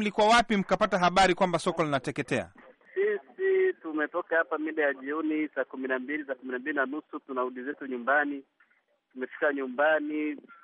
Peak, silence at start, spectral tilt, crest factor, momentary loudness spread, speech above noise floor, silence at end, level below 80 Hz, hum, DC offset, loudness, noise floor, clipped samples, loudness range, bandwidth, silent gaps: -14 dBFS; 0 s; -5 dB/octave; 16 dB; 12 LU; 42 dB; 0.1 s; -60 dBFS; none; under 0.1%; -28 LUFS; -70 dBFS; under 0.1%; 5 LU; 11 kHz; none